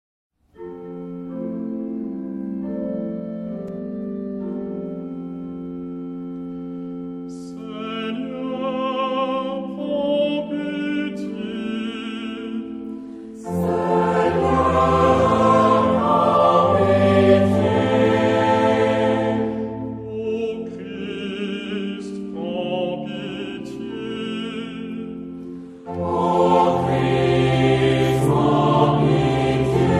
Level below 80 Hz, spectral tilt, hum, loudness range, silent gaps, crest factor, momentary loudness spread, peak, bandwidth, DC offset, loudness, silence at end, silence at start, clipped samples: -46 dBFS; -7.5 dB/octave; none; 14 LU; none; 18 dB; 15 LU; -4 dBFS; 13.5 kHz; under 0.1%; -21 LUFS; 0 s; 0.6 s; under 0.1%